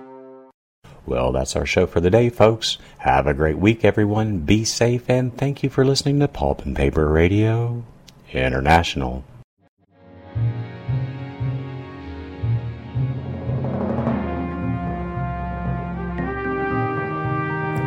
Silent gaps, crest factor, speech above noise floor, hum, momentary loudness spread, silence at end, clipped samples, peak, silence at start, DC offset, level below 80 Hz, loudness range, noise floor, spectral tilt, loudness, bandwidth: 0.54-0.82 s, 9.44-9.57 s, 9.69-9.77 s; 20 dB; 28 dB; none; 12 LU; 0 s; under 0.1%; 0 dBFS; 0 s; under 0.1%; -34 dBFS; 9 LU; -46 dBFS; -6 dB/octave; -21 LUFS; 16 kHz